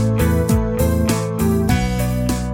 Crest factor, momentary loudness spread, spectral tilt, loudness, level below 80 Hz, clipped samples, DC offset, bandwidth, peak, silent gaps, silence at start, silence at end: 12 dB; 3 LU; -6.5 dB/octave; -18 LUFS; -26 dBFS; under 0.1%; under 0.1%; 17 kHz; -4 dBFS; none; 0 s; 0 s